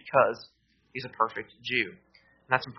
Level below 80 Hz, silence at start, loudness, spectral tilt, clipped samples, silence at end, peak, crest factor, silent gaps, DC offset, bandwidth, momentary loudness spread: -70 dBFS; 0.05 s; -29 LUFS; -2 dB/octave; under 0.1%; 0.05 s; -6 dBFS; 24 dB; none; under 0.1%; 6.2 kHz; 15 LU